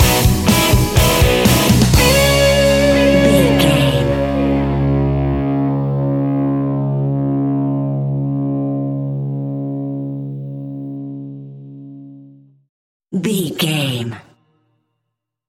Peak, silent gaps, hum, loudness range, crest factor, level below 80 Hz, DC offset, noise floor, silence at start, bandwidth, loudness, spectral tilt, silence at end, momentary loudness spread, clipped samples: 0 dBFS; 12.69-13.00 s; none; 14 LU; 16 dB; -26 dBFS; under 0.1%; -77 dBFS; 0 s; 17 kHz; -15 LUFS; -5 dB/octave; 1.25 s; 16 LU; under 0.1%